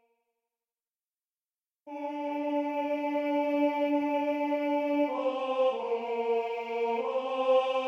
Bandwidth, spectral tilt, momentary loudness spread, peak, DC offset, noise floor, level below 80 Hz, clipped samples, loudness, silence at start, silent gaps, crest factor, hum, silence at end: 13.5 kHz; -4.5 dB/octave; 6 LU; -14 dBFS; under 0.1%; under -90 dBFS; -82 dBFS; under 0.1%; -30 LUFS; 1.85 s; none; 16 dB; none; 0 s